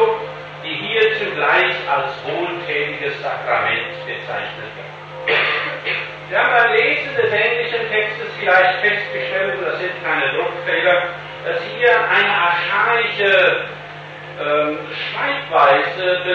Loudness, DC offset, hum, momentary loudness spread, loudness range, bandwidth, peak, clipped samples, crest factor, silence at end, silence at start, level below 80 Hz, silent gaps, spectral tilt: -17 LUFS; under 0.1%; 50 Hz at -45 dBFS; 12 LU; 5 LU; 7.4 kHz; -2 dBFS; under 0.1%; 16 dB; 0 s; 0 s; -60 dBFS; none; -5 dB/octave